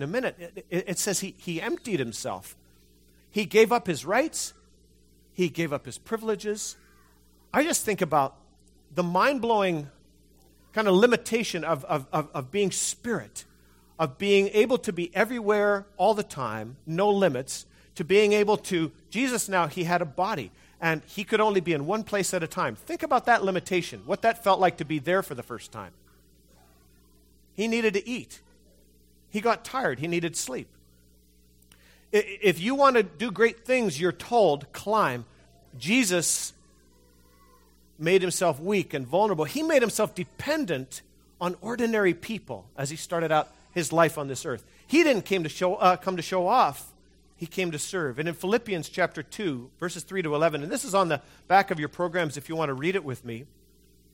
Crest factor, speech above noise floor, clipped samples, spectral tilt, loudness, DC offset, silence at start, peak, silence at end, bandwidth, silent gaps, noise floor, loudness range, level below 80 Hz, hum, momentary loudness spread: 22 dB; 34 dB; under 0.1%; -4 dB/octave; -26 LUFS; under 0.1%; 0 s; -6 dBFS; 0.65 s; 16.5 kHz; none; -60 dBFS; 5 LU; -62 dBFS; none; 13 LU